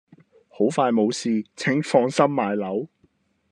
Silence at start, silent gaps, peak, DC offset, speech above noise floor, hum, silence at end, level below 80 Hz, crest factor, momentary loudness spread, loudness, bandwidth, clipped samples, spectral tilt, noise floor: 0.6 s; none; -4 dBFS; under 0.1%; 43 dB; none; 0.65 s; -74 dBFS; 20 dB; 7 LU; -22 LUFS; 10.5 kHz; under 0.1%; -5.5 dB/octave; -64 dBFS